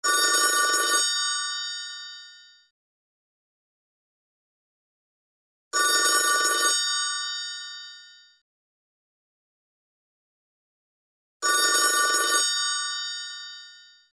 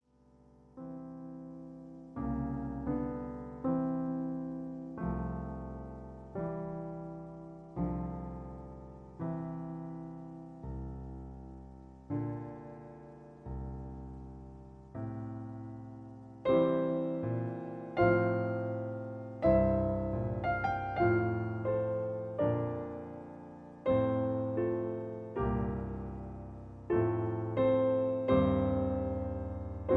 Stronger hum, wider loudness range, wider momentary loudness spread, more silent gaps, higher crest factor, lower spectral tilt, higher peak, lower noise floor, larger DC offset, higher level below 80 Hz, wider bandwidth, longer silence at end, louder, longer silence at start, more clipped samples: neither; about the same, 14 LU vs 12 LU; about the same, 18 LU vs 19 LU; first, 2.71-5.71 s, 8.41-11.40 s vs none; about the same, 20 dB vs 20 dB; second, 3.5 dB/octave vs -10.5 dB/octave; first, -8 dBFS vs -14 dBFS; second, -50 dBFS vs -64 dBFS; neither; second, -86 dBFS vs -50 dBFS; first, 11 kHz vs 5.2 kHz; first, 0.35 s vs 0 s; first, -22 LUFS vs -34 LUFS; second, 0 s vs 0.75 s; neither